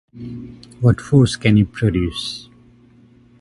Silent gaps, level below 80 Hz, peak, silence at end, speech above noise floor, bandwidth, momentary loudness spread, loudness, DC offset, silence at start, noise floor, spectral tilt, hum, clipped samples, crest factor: none; -38 dBFS; 0 dBFS; 1 s; 32 dB; 11.5 kHz; 19 LU; -17 LUFS; under 0.1%; 0.15 s; -49 dBFS; -6.5 dB/octave; none; under 0.1%; 18 dB